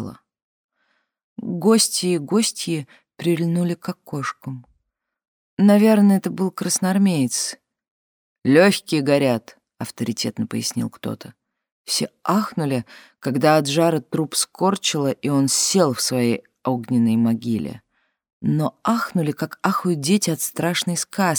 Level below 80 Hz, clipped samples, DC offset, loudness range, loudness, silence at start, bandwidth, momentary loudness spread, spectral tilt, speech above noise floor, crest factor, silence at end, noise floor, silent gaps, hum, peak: -66 dBFS; under 0.1%; under 0.1%; 5 LU; -20 LUFS; 0 s; over 20 kHz; 13 LU; -4.5 dB/octave; 54 dB; 20 dB; 0 s; -74 dBFS; 0.42-0.69 s, 1.24-1.36 s, 5.28-5.57 s, 7.91-8.36 s, 11.72-11.84 s, 18.33-18.41 s; none; -2 dBFS